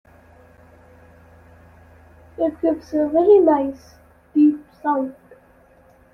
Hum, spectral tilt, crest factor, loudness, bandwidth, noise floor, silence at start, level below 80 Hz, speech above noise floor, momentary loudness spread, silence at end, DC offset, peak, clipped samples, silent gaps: none; -8 dB/octave; 18 dB; -19 LUFS; 6.2 kHz; -52 dBFS; 2.4 s; -56 dBFS; 34 dB; 15 LU; 1.05 s; under 0.1%; -4 dBFS; under 0.1%; none